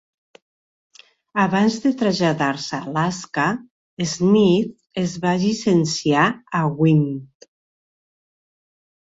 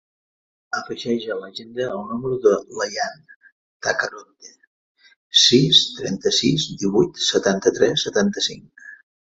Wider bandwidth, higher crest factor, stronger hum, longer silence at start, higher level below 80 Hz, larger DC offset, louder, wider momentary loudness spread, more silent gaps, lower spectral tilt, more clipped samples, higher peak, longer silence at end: about the same, 8 kHz vs 8 kHz; about the same, 18 dB vs 20 dB; neither; first, 1.35 s vs 0.75 s; about the same, -58 dBFS vs -58 dBFS; neither; about the same, -20 LUFS vs -19 LUFS; second, 9 LU vs 15 LU; second, 3.71-3.97 s vs 3.36-3.41 s, 3.52-3.80 s, 4.67-4.95 s, 5.16-5.30 s; first, -5.5 dB/octave vs -3.5 dB/octave; neither; about the same, -4 dBFS vs -2 dBFS; first, 1.9 s vs 0.4 s